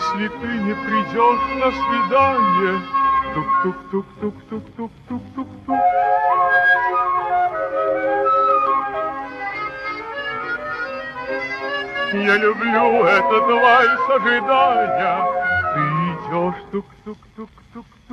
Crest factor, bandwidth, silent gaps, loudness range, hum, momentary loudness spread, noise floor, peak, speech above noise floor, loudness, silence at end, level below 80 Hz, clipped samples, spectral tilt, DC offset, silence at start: 16 dB; 8 kHz; none; 7 LU; none; 15 LU; -41 dBFS; -2 dBFS; 23 dB; -18 LUFS; 0 s; -52 dBFS; under 0.1%; -6 dB/octave; under 0.1%; 0 s